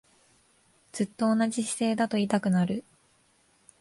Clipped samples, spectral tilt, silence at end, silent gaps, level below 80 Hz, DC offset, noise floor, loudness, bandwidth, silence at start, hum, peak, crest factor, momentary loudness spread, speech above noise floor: under 0.1%; -5.5 dB/octave; 1 s; none; -68 dBFS; under 0.1%; -66 dBFS; -27 LUFS; 11.5 kHz; 0.95 s; none; -12 dBFS; 16 dB; 8 LU; 39 dB